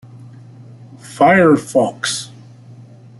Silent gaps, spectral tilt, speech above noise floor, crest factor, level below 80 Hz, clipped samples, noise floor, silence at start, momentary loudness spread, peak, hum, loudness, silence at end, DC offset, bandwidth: none; -5 dB/octave; 26 dB; 16 dB; -58 dBFS; under 0.1%; -40 dBFS; 1.05 s; 20 LU; -2 dBFS; none; -14 LUFS; 0.95 s; under 0.1%; 12 kHz